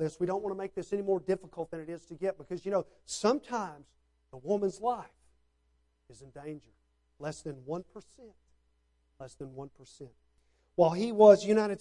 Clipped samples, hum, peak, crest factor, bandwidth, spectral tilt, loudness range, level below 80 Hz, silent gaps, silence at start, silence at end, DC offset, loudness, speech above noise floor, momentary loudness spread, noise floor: under 0.1%; none; -8 dBFS; 24 dB; 11 kHz; -6 dB/octave; 16 LU; -68 dBFS; none; 0 s; 0.05 s; under 0.1%; -30 LUFS; 42 dB; 22 LU; -73 dBFS